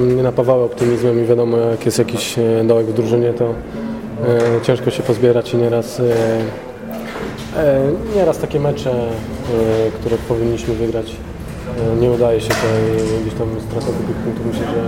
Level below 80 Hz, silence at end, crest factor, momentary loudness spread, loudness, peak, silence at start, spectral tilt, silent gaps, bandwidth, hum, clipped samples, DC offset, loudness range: -36 dBFS; 0 s; 16 dB; 11 LU; -17 LUFS; 0 dBFS; 0 s; -6.5 dB/octave; none; 16.5 kHz; none; under 0.1%; under 0.1%; 3 LU